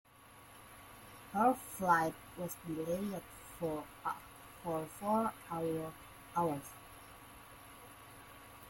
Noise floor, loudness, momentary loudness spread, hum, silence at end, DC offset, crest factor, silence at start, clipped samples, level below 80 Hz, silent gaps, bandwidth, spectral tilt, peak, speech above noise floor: -59 dBFS; -38 LUFS; 22 LU; none; 0 s; under 0.1%; 24 dB; 0.2 s; under 0.1%; -66 dBFS; none; 16.5 kHz; -5.5 dB/octave; -16 dBFS; 22 dB